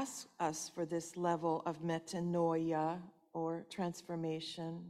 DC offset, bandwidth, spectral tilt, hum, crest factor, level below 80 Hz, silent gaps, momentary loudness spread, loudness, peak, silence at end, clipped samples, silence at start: under 0.1%; 14.5 kHz; -5.5 dB/octave; none; 16 dB; -78 dBFS; none; 7 LU; -39 LUFS; -22 dBFS; 0 s; under 0.1%; 0 s